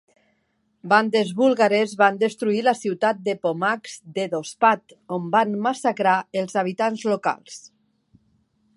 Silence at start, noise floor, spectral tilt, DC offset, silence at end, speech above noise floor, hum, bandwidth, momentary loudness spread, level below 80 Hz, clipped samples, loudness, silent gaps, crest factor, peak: 0.85 s; -69 dBFS; -5 dB/octave; under 0.1%; 1.2 s; 48 dB; none; 11.5 kHz; 11 LU; -74 dBFS; under 0.1%; -22 LUFS; none; 20 dB; -2 dBFS